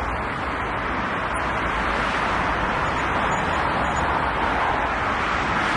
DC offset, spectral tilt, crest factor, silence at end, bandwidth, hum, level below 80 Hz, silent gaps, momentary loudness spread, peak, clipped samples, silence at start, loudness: under 0.1%; -5 dB/octave; 14 dB; 0 s; 11.5 kHz; none; -36 dBFS; none; 3 LU; -10 dBFS; under 0.1%; 0 s; -23 LUFS